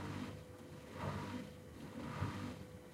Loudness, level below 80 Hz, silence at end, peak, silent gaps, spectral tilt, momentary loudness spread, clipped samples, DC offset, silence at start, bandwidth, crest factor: -47 LUFS; -64 dBFS; 0 s; -28 dBFS; none; -6 dB/octave; 10 LU; under 0.1%; under 0.1%; 0 s; 16 kHz; 20 dB